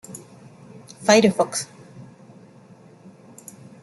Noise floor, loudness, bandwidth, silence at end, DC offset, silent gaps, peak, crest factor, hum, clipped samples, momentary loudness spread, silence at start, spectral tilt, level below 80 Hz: -48 dBFS; -19 LUFS; 12.5 kHz; 1.8 s; under 0.1%; none; -2 dBFS; 24 dB; none; under 0.1%; 28 LU; 0.1 s; -4 dB/octave; -68 dBFS